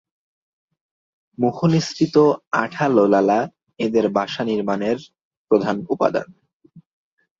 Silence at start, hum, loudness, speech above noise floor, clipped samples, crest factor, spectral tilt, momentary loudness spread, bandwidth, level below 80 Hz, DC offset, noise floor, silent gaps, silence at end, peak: 1.4 s; none; -20 LUFS; 32 dB; under 0.1%; 18 dB; -6.5 dB/octave; 8 LU; 7.8 kHz; -62 dBFS; under 0.1%; -51 dBFS; 2.47-2.51 s, 5.21-5.31 s, 5.37-5.45 s, 6.53-6.60 s; 0.6 s; -2 dBFS